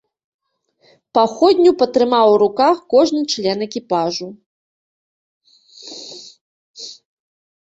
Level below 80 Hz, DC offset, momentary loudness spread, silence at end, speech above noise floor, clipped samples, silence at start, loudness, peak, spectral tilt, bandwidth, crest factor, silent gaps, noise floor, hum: -64 dBFS; under 0.1%; 21 LU; 0.85 s; 44 dB; under 0.1%; 1.15 s; -15 LUFS; -2 dBFS; -4.5 dB/octave; 8 kHz; 18 dB; 4.46-5.41 s, 6.41-6.74 s; -59 dBFS; none